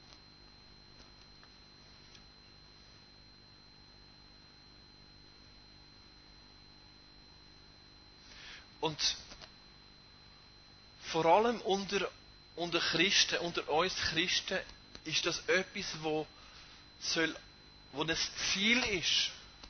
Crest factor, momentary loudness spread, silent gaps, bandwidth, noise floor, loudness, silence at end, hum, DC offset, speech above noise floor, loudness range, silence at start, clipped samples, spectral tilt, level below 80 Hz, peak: 24 dB; 26 LU; none; 6.6 kHz; -59 dBFS; -32 LUFS; 0 s; 50 Hz at -65 dBFS; under 0.1%; 26 dB; 10 LU; 0.1 s; under 0.1%; -2 dB/octave; -62 dBFS; -14 dBFS